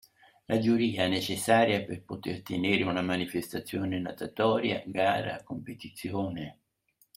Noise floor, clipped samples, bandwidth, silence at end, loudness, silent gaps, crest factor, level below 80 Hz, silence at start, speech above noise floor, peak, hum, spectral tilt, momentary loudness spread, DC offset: -70 dBFS; under 0.1%; 16.5 kHz; 0.65 s; -29 LUFS; none; 22 dB; -66 dBFS; 0.5 s; 40 dB; -8 dBFS; none; -5 dB/octave; 13 LU; under 0.1%